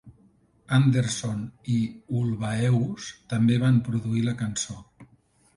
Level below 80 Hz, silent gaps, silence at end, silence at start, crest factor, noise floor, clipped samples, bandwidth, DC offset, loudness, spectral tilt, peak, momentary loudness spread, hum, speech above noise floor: -56 dBFS; none; 0.5 s; 0.05 s; 16 dB; -62 dBFS; under 0.1%; 11.5 kHz; under 0.1%; -25 LUFS; -6 dB/octave; -10 dBFS; 10 LU; none; 37 dB